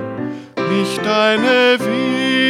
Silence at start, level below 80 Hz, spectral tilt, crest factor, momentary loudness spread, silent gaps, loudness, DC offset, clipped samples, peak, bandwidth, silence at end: 0 s; -62 dBFS; -4.5 dB/octave; 14 dB; 13 LU; none; -15 LUFS; under 0.1%; under 0.1%; -2 dBFS; 15 kHz; 0 s